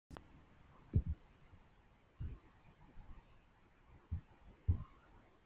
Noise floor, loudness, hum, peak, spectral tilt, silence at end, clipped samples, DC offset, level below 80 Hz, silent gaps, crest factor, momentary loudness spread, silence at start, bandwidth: -68 dBFS; -44 LUFS; none; -22 dBFS; -9.5 dB/octave; 0.25 s; under 0.1%; under 0.1%; -52 dBFS; none; 24 dB; 26 LU; 0.1 s; 4 kHz